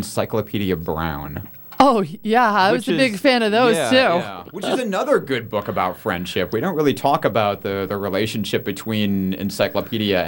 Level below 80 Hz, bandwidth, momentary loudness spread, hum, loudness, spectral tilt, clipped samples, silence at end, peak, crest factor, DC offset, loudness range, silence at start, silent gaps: -48 dBFS; 17 kHz; 9 LU; none; -19 LUFS; -5 dB/octave; under 0.1%; 0 s; -2 dBFS; 18 dB; under 0.1%; 4 LU; 0 s; none